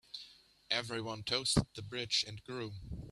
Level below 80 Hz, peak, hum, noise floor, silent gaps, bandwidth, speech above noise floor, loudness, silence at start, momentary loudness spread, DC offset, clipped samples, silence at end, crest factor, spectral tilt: -54 dBFS; -16 dBFS; none; -59 dBFS; none; 13 kHz; 22 dB; -36 LUFS; 0.15 s; 16 LU; under 0.1%; under 0.1%; 0 s; 24 dB; -3.5 dB/octave